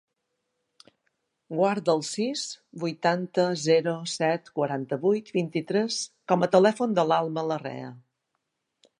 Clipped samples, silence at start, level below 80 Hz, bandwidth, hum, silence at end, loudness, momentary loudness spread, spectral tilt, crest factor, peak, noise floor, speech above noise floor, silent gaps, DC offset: under 0.1%; 1.5 s; -78 dBFS; 11.5 kHz; none; 1 s; -26 LUFS; 11 LU; -5 dB/octave; 22 dB; -6 dBFS; -80 dBFS; 54 dB; none; under 0.1%